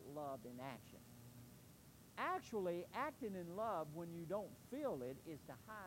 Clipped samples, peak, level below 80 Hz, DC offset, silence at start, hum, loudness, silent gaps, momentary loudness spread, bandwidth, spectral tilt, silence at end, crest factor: under 0.1%; -30 dBFS; -76 dBFS; under 0.1%; 0 s; none; -48 LUFS; none; 16 LU; 16 kHz; -6 dB/octave; 0 s; 18 dB